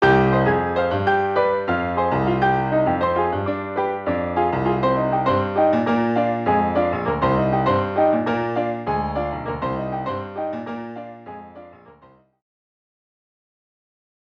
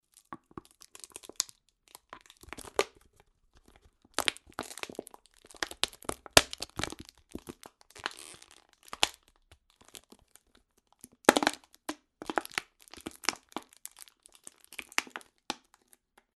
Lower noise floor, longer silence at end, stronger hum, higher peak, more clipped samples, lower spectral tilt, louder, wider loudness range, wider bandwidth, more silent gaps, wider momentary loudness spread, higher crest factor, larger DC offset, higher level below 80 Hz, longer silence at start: second, -52 dBFS vs -69 dBFS; first, 2.45 s vs 0.8 s; neither; second, -6 dBFS vs -2 dBFS; neither; first, -8.5 dB/octave vs -1.5 dB/octave; first, -21 LUFS vs -32 LUFS; first, 12 LU vs 8 LU; second, 7 kHz vs 12 kHz; neither; second, 9 LU vs 26 LU; second, 16 dB vs 36 dB; neither; first, -44 dBFS vs -60 dBFS; second, 0 s vs 0.3 s